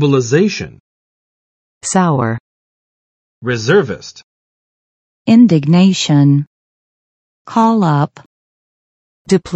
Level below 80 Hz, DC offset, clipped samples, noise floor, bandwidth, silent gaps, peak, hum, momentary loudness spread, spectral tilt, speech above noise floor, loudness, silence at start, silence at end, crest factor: -54 dBFS; under 0.1%; under 0.1%; under -90 dBFS; 8.8 kHz; 0.80-1.81 s, 2.40-3.41 s, 4.24-5.25 s, 6.47-7.45 s, 8.26-9.25 s; 0 dBFS; none; 16 LU; -6 dB/octave; over 78 dB; -13 LUFS; 0 s; 0 s; 16 dB